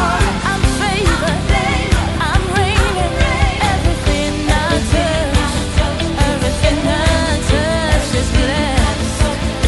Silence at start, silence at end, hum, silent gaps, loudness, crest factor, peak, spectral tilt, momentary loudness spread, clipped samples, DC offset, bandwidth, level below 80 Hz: 0 s; 0 s; none; none; -15 LUFS; 14 dB; 0 dBFS; -5 dB/octave; 2 LU; under 0.1%; under 0.1%; 12 kHz; -20 dBFS